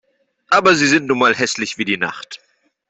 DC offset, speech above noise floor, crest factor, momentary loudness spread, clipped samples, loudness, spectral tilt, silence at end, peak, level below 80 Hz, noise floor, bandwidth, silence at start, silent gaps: under 0.1%; 20 dB; 16 dB; 19 LU; under 0.1%; -15 LUFS; -3 dB/octave; 0.55 s; -2 dBFS; -60 dBFS; -36 dBFS; 8.4 kHz; 0.5 s; none